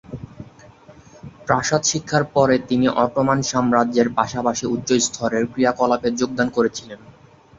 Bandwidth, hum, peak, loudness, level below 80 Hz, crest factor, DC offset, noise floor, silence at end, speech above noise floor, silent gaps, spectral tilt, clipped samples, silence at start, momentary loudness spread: 7.8 kHz; none; -2 dBFS; -19 LUFS; -52 dBFS; 18 dB; under 0.1%; -48 dBFS; 0.6 s; 28 dB; none; -4.5 dB/octave; under 0.1%; 0.1 s; 6 LU